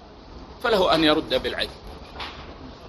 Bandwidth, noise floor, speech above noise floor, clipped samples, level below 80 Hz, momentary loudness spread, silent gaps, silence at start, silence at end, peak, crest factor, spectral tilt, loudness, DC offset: 13.5 kHz; -43 dBFS; 21 dB; under 0.1%; -44 dBFS; 23 LU; none; 0 s; 0 s; -4 dBFS; 22 dB; -5 dB/octave; -22 LUFS; under 0.1%